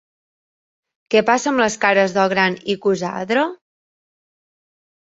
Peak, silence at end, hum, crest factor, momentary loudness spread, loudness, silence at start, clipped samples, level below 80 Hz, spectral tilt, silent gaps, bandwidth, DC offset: -2 dBFS; 1.5 s; none; 20 dB; 5 LU; -18 LUFS; 1.1 s; under 0.1%; -62 dBFS; -4 dB/octave; none; 8 kHz; under 0.1%